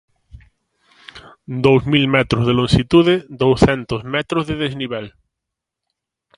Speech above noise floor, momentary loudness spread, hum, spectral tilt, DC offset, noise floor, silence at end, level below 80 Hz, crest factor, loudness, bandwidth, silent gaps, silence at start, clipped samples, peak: 66 dB; 12 LU; none; -6.5 dB/octave; under 0.1%; -82 dBFS; 1.3 s; -38 dBFS; 18 dB; -16 LUFS; 11 kHz; none; 1.15 s; under 0.1%; 0 dBFS